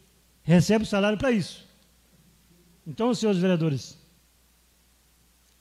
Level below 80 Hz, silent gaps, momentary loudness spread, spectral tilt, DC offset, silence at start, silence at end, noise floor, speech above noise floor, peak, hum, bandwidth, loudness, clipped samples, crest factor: -56 dBFS; none; 21 LU; -6.5 dB/octave; under 0.1%; 0.45 s; 1.7 s; -62 dBFS; 39 dB; -8 dBFS; none; 13.5 kHz; -24 LUFS; under 0.1%; 20 dB